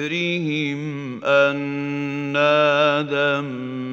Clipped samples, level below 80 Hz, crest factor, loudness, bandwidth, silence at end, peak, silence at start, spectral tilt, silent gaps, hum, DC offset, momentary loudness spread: under 0.1%; -72 dBFS; 16 dB; -20 LUFS; 7.6 kHz; 0 s; -4 dBFS; 0 s; -6 dB/octave; none; none; under 0.1%; 11 LU